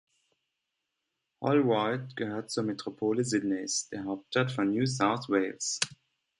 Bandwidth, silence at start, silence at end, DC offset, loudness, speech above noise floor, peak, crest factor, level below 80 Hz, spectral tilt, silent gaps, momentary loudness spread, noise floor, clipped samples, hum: 11.5 kHz; 1.4 s; 0.45 s; under 0.1%; -30 LUFS; 54 dB; -10 dBFS; 20 dB; -72 dBFS; -4.5 dB/octave; none; 8 LU; -84 dBFS; under 0.1%; none